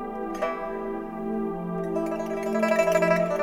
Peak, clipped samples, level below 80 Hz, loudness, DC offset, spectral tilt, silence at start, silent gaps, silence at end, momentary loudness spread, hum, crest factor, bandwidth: -8 dBFS; under 0.1%; -52 dBFS; -27 LUFS; under 0.1%; -6 dB/octave; 0 s; none; 0 s; 11 LU; none; 18 dB; 18.5 kHz